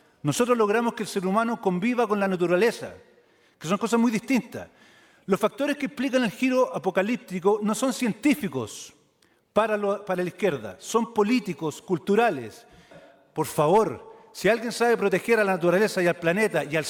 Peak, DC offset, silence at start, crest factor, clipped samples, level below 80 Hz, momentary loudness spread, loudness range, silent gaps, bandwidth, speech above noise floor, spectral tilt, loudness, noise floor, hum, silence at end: -8 dBFS; under 0.1%; 0.25 s; 18 dB; under 0.1%; -66 dBFS; 11 LU; 3 LU; none; 18.5 kHz; 40 dB; -5 dB/octave; -24 LUFS; -64 dBFS; none; 0 s